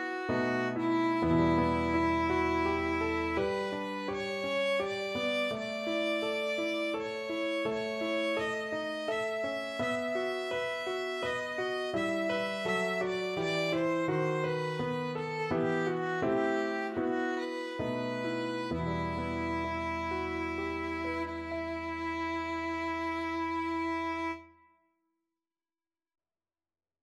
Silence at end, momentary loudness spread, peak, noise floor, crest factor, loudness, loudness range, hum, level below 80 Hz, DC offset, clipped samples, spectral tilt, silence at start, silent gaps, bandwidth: 2.55 s; 6 LU; -16 dBFS; under -90 dBFS; 16 dB; -32 LUFS; 5 LU; none; -54 dBFS; under 0.1%; under 0.1%; -5.5 dB/octave; 0 s; none; 13 kHz